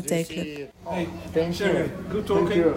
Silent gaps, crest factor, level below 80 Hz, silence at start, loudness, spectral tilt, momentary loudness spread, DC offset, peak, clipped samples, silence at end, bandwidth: none; 16 dB; -50 dBFS; 0 s; -26 LUFS; -5.5 dB/octave; 10 LU; under 0.1%; -10 dBFS; under 0.1%; 0 s; 16 kHz